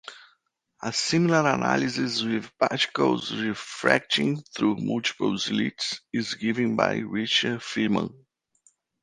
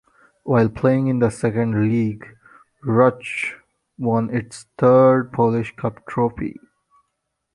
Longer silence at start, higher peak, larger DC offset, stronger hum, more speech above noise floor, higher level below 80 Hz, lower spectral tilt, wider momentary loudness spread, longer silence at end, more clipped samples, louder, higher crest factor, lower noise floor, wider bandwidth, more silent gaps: second, 0.05 s vs 0.45 s; about the same, -2 dBFS vs -2 dBFS; neither; neither; second, 44 dB vs 57 dB; second, -64 dBFS vs -52 dBFS; second, -4.5 dB/octave vs -8 dB/octave; second, 8 LU vs 13 LU; about the same, 0.9 s vs 1 s; neither; second, -25 LUFS vs -19 LUFS; first, 24 dB vs 18 dB; second, -70 dBFS vs -76 dBFS; about the same, 11.5 kHz vs 11.5 kHz; neither